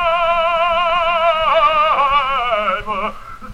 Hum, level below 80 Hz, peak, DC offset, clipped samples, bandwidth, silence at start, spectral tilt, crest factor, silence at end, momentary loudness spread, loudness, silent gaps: none; -38 dBFS; -4 dBFS; under 0.1%; under 0.1%; 11 kHz; 0 s; -3.5 dB/octave; 12 dB; 0 s; 9 LU; -15 LUFS; none